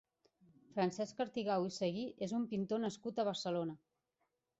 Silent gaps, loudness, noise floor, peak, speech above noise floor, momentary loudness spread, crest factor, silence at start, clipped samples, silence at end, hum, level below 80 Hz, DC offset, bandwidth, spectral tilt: none; -39 LUFS; -85 dBFS; -24 dBFS; 47 dB; 5 LU; 16 dB; 0.75 s; under 0.1%; 0.85 s; none; -80 dBFS; under 0.1%; 8 kHz; -5 dB/octave